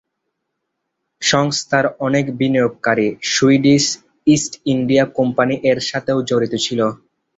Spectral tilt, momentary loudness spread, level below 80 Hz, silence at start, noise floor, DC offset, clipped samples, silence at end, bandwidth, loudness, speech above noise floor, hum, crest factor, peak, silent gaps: -4.5 dB/octave; 6 LU; -54 dBFS; 1.2 s; -75 dBFS; under 0.1%; under 0.1%; 0.45 s; 8 kHz; -17 LUFS; 59 dB; none; 16 dB; -2 dBFS; none